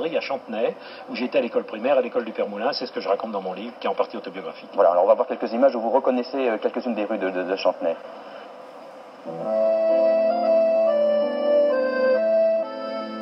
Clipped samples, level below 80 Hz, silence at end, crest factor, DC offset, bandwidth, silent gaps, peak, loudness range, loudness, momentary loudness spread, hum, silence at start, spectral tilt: under 0.1%; -88 dBFS; 0 s; 18 dB; under 0.1%; 6 kHz; none; -6 dBFS; 6 LU; -22 LUFS; 15 LU; none; 0 s; -6.5 dB/octave